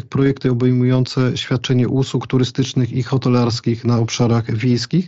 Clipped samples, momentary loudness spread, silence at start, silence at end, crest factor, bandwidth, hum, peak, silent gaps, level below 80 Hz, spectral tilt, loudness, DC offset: under 0.1%; 3 LU; 0.1 s; 0 s; 14 dB; 7.8 kHz; none; -4 dBFS; none; -48 dBFS; -6.5 dB/octave; -17 LUFS; 0.3%